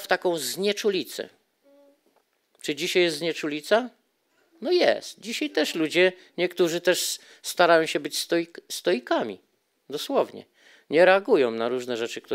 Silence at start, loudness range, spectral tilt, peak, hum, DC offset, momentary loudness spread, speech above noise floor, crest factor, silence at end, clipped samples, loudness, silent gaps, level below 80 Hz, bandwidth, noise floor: 0 s; 4 LU; -3 dB/octave; -4 dBFS; none; under 0.1%; 14 LU; 44 dB; 22 dB; 0 s; under 0.1%; -24 LUFS; none; -88 dBFS; 16 kHz; -68 dBFS